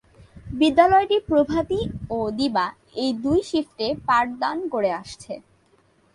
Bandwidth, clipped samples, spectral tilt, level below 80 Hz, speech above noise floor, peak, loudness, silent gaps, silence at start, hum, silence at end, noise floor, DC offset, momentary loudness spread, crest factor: 11.5 kHz; under 0.1%; -5.5 dB/octave; -48 dBFS; 38 dB; -2 dBFS; -22 LUFS; none; 0.35 s; none; 0.75 s; -60 dBFS; under 0.1%; 15 LU; 20 dB